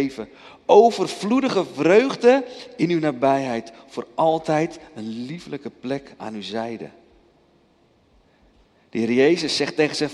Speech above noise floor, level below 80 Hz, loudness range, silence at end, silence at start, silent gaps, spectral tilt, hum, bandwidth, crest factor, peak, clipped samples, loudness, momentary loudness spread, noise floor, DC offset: 38 dB; -64 dBFS; 15 LU; 0 s; 0 s; none; -5 dB/octave; none; 11.5 kHz; 20 dB; -2 dBFS; under 0.1%; -20 LUFS; 18 LU; -59 dBFS; under 0.1%